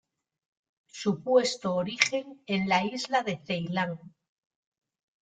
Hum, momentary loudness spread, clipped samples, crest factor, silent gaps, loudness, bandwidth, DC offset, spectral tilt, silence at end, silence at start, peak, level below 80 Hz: none; 9 LU; under 0.1%; 28 dB; none; -28 LUFS; 9.4 kHz; under 0.1%; -4 dB/octave; 1.15 s; 0.95 s; -2 dBFS; -70 dBFS